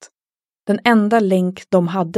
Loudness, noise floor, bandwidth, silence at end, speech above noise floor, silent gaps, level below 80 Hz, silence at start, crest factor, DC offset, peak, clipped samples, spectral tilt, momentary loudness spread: -16 LUFS; under -90 dBFS; 12.5 kHz; 0 s; over 74 dB; none; -68 dBFS; 0 s; 16 dB; under 0.1%; 0 dBFS; under 0.1%; -7 dB/octave; 7 LU